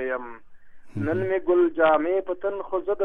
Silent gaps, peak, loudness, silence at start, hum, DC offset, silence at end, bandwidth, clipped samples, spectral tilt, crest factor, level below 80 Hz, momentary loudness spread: none; -8 dBFS; -24 LUFS; 0 s; none; under 0.1%; 0 s; 3.9 kHz; under 0.1%; -9 dB/octave; 16 dB; -54 dBFS; 12 LU